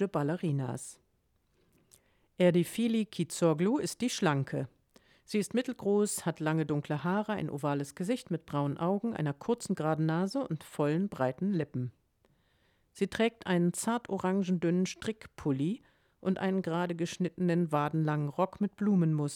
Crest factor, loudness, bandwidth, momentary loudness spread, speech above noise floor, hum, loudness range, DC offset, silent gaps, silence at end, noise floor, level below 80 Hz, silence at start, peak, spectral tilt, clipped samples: 18 dB; -32 LUFS; 17 kHz; 7 LU; 43 dB; none; 2 LU; under 0.1%; none; 0 s; -73 dBFS; -68 dBFS; 0 s; -14 dBFS; -6 dB/octave; under 0.1%